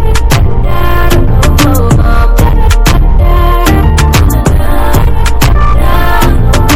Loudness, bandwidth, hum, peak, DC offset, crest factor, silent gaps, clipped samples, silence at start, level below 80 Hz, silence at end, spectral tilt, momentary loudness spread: -9 LUFS; 16.5 kHz; none; 0 dBFS; under 0.1%; 4 dB; none; 0.3%; 0 s; -8 dBFS; 0 s; -5.5 dB/octave; 3 LU